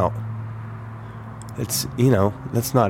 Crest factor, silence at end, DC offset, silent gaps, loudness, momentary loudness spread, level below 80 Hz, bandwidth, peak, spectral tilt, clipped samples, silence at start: 18 dB; 0 s; under 0.1%; none; -23 LUFS; 18 LU; -48 dBFS; 17 kHz; -4 dBFS; -5.5 dB/octave; under 0.1%; 0 s